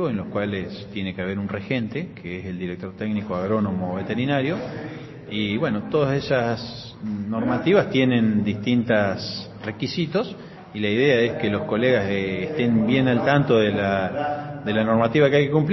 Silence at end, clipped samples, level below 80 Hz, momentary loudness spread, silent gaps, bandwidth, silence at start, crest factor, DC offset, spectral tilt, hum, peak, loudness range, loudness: 0 s; under 0.1%; -54 dBFS; 13 LU; none; 6.2 kHz; 0 s; 20 dB; under 0.1%; -5 dB/octave; none; -4 dBFS; 6 LU; -23 LUFS